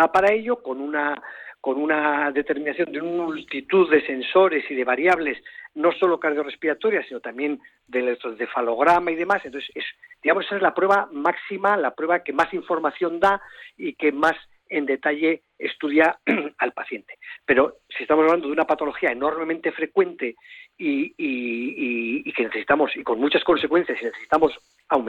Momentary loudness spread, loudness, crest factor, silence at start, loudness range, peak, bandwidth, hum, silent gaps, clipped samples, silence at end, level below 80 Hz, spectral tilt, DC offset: 12 LU; -22 LUFS; 16 dB; 0 s; 3 LU; -6 dBFS; 9.6 kHz; none; none; under 0.1%; 0 s; -60 dBFS; -5.5 dB/octave; under 0.1%